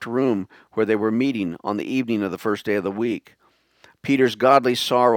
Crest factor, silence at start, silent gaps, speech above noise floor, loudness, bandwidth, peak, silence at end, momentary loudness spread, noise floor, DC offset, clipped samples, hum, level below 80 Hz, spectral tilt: 20 dB; 0 s; none; 35 dB; -22 LUFS; 19 kHz; 0 dBFS; 0 s; 10 LU; -56 dBFS; under 0.1%; under 0.1%; none; -68 dBFS; -5.5 dB/octave